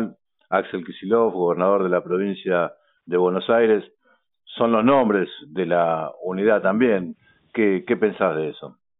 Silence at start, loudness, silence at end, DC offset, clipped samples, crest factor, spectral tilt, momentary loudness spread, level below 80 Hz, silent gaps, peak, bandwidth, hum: 0 s; -21 LUFS; 0.3 s; under 0.1%; under 0.1%; 18 dB; -5 dB/octave; 11 LU; -64 dBFS; none; -4 dBFS; 4 kHz; none